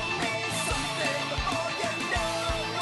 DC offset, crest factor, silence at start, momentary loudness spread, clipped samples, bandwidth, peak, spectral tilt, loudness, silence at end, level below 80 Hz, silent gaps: under 0.1%; 14 dB; 0 s; 1 LU; under 0.1%; 12.5 kHz; -16 dBFS; -3 dB/octave; -28 LUFS; 0 s; -42 dBFS; none